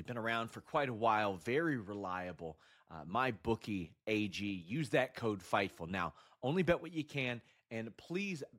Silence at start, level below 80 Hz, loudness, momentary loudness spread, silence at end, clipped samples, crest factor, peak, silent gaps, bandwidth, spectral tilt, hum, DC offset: 0 s; -66 dBFS; -38 LUFS; 11 LU; 0 s; under 0.1%; 20 dB; -18 dBFS; none; 16 kHz; -6 dB/octave; none; under 0.1%